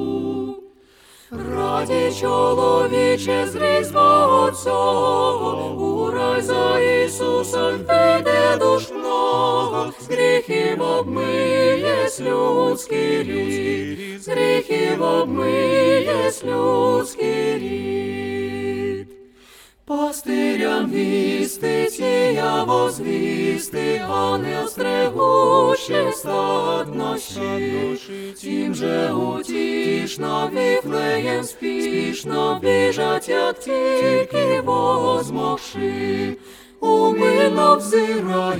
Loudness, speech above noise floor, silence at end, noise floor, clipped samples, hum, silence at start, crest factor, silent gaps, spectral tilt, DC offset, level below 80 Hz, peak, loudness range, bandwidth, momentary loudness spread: -19 LUFS; 31 dB; 0 s; -50 dBFS; under 0.1%; none; 0 s; 18 dB; none; -4.5 dB/octave; under 0.1%; -56 dBFS; 0 dBFS; 5 LU; 17.5 kHz; 9 LU